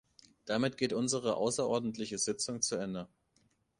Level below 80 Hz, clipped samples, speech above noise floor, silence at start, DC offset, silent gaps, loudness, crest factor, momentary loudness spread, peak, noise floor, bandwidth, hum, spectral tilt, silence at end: -70 dBFS; under 0.1%; 40 dB; 0.45 s; under 0.1%; none; -34 LUFS; 18 dB; 9 LU; -18 dBFS; -73 dBFS; 11.5 kHz; none; -3.5 dB/octave; 0.75 s